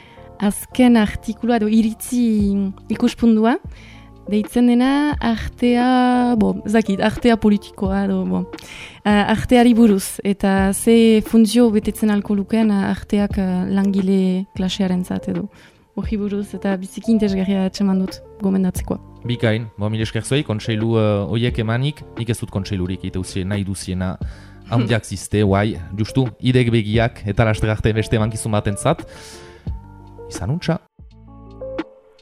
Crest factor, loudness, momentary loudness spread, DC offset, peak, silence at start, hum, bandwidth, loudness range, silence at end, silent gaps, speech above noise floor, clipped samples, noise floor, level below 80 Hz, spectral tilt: 16 dB; -18 LUFS; 12 LU; under 0.1%; -2 dBFS; 0.15 s; none; 15.5 kHz; 7 LU; 0.4 s; none; 25 dB; under 0.1%; -42 dBFS; -38 dBFS; -6.5 dB/octave